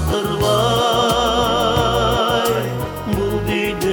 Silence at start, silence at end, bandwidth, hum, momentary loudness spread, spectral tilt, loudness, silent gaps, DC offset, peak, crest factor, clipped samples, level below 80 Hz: 0 s; 0 s; 19.5 kHz; none; 6 LU; -4.5 dB/octave; -17 LUFS; none; under 0.1%; -4 dBFS; 14 dB; under 0.1%; -32 dBFS